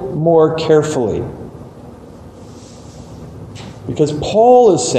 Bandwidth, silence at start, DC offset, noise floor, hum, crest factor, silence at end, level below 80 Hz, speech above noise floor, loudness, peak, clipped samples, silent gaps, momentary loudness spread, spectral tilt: 9.6 kHz; 0 s; under 0.1%; -36 dBFS; none; 14 dB; 0 s; -44 dBFS; 24 dB; -13 LUFS; 0 dBFS; under 0.1%; none; 26 LU; -5.5 dB/octave